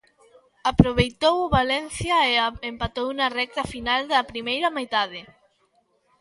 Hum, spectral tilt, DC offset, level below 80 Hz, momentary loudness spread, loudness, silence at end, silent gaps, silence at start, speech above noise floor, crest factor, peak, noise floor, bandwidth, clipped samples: none; -5 dB/octave; under 0.1%; -40 dBFS; 9 LU; -23 LUFS; 0.95 s; none; 0.65 s; 43 dB; 24 dB; 0 dBFS; -66 dBFS; 11.5 kHz; under 0.1%